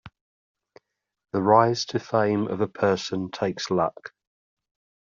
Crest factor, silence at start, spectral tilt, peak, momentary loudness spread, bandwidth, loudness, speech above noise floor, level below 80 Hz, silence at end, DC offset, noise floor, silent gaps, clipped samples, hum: 22 dB; 0.05 s; -4.5 dB/octave; -4 dBFS; 11 LU; 7.6 kHz; -24 LUFS; 34 dB; -66 dBFS; 0.95 s; under 0.1%; -58 dBFS; 0.21-0.55 s; under 0.1%; none